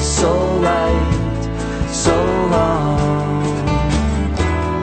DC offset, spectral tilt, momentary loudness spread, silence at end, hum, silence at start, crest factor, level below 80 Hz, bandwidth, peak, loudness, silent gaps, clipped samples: under 0.1%; -5.5 dB/octave; 5 LU; 0 s; none; 0 s; 14 dB; -24 dBFS; 9.2 kHz; -2 dBFS; -17 LUFS; none; under 0.1%